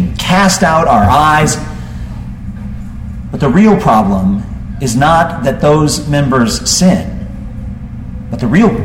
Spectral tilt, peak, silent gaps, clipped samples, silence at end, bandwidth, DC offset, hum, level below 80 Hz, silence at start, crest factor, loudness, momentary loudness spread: -5 dB/octave; 0 dBFS; none; under 0.1%; 0 s; 16.5 kHz; under 0.1%; none; -26 dBFS; 0 s; 12 dB; -10 LUFS; 17 LU